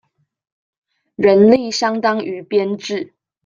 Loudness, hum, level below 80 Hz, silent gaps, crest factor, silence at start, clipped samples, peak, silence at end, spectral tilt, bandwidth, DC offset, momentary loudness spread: -16 LUFS; none; -60 dBFS; none; 16 dB; 1.2 s; under 0.1%; -2 dBFS; 0.4 s; -5 dB/octave; 7.6 kHz; under 0.1%; 14 LU